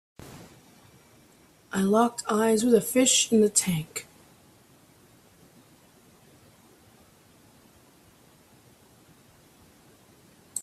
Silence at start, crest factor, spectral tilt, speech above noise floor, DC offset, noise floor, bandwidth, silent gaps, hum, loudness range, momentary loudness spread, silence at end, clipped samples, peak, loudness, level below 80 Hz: 0.2 s; 22 dB; -3.5 dB/octave; 35 dB; under 0.1%; -58 dBFS; 15.5 kHz; none; none; 14 LU; 27 LU; 0 s; under 0.1%; -8 dBFS; -23 LUFS; -66 dBFS